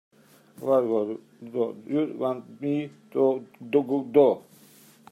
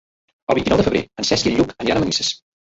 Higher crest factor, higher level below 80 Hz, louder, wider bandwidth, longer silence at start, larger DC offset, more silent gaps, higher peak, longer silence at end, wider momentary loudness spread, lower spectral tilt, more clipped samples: about the same, 20 dB vs 18 dB; second, -78 dBFS vs -42 dBFS; second, -26 LUFS vs -19 LUFS; first, 14 kHz vs 8.2 kHz; about the same, 0.6 s vs 0.5 s; neither; neither; second, -6 dBFS vs -2 dBFS; first, 0.7 s vs 0.35 s; first, 13 LU vs 5 LU; first, -8 dB/octave vs -4 dB/octave; neither